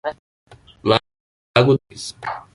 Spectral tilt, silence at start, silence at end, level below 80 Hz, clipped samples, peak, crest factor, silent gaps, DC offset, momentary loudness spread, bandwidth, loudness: -5.5 dB/octave; 0.05 s; 0.15 s; -52 dBFS; under 0.1%; -2 dBFS; 20 dB; 0.19-0.47 s, 1.20-1.54 s; under 0.1%; 14 LU; 11.5 kHz; -20 LUFS